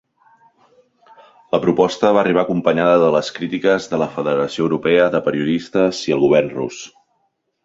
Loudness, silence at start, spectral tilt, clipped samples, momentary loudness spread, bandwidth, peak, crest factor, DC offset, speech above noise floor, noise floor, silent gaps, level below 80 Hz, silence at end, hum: -17 LUFS; 1.55 s; -6 dB/octave; under 0.1%; 8 LU; 8 kHz; 0 dBFS; 18 dB; under 0.1%; 51 dB; -68 dBFS; none; -56 dBFS; 0.75 s; none